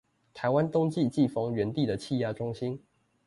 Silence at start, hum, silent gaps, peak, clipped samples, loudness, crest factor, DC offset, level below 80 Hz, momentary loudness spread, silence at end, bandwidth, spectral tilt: 0.35 s; none; none; -14 dBFS; under 0.1%; -29 LUFS; 16 dB; under 0.1%; -62 dBFS; 8 LU; 0.5 s; 11.5 kHz; -7.5 dB/octave